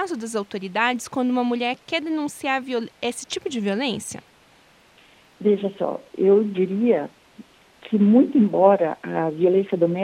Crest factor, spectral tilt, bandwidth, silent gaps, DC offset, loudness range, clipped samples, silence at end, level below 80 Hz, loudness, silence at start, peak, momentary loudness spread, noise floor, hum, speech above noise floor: 18 dB; -5.5 dB/octave; 13.5 kHz; none; under 0.1%; 7 LU; under 0.1%; 0 s; -68 dBFS; -22 LUFS; 0 s; -4 dBFS; 12 LU; -55 dBFS; none; 34 dB